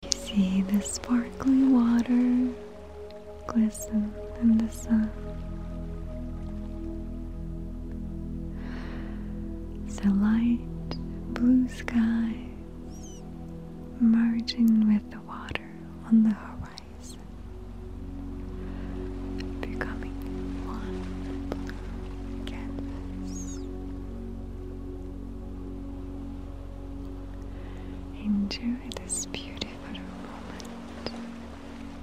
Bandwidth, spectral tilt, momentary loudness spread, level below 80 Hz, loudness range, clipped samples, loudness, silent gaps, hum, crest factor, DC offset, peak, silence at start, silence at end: 14 kHz; -5.5 dB/octave; 18 LU; -40 dBFS; 12 LU; under 0.1%; -30 LUFS; none; none; 30 dB; 0.3%; 0 dBFS; 0 s; 0 s